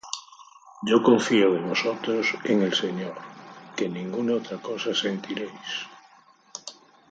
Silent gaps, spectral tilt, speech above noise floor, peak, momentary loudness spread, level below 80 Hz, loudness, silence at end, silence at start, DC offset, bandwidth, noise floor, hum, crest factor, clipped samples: none; -4.5 dB/octave; 31 dB; -4 dBFS; 20 LU; -74 dBFS; -25 LUFS; 0.4 s; 0.05 s; under 0.1%; 9 kHz; -56 dBFS; none; 22 dB; under 0.1%